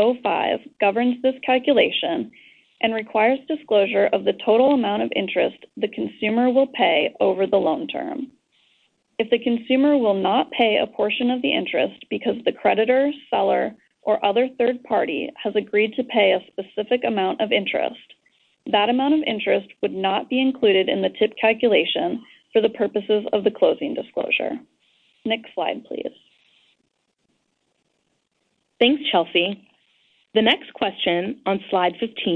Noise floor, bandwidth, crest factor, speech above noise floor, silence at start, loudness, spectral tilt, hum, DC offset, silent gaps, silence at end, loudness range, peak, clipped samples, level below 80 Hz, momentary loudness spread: -71 dBFS; 4.6 kHz; 18 dB; 51 dB; 0 s; -21 LUFS; -7.5 dB/octave; none; under 0.1%; none; 0 s; 5 LU; -4 dBFS; under 0.1%; -66 dBFS; 9 LU